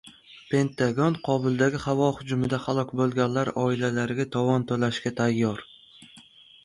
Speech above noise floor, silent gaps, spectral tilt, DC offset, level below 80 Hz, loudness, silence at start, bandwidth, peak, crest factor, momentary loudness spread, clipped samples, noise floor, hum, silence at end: 27 dB; none; -6.5 dB/octave; under 0.1%; -58 dBFS; -25 LUFS; 0.05 s; 11.5 kHz; -8 dBFS; 18 dB; 3 LU; under 0.1%; -52 dBFS; none; 0.45 s